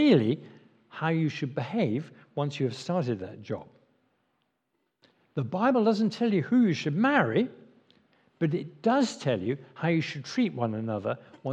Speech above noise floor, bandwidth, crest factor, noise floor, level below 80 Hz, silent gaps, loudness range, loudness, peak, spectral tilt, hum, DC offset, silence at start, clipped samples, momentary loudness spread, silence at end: 51 dB; 9 kHz; 20 dB; -78 dBFS; -80 dBFS; none; 7 LU; -28 LUFS; -8 dBFS; -7 dB/octave; none; under 0.1%; 0 s; under 0.1%; 11 LU; 0 s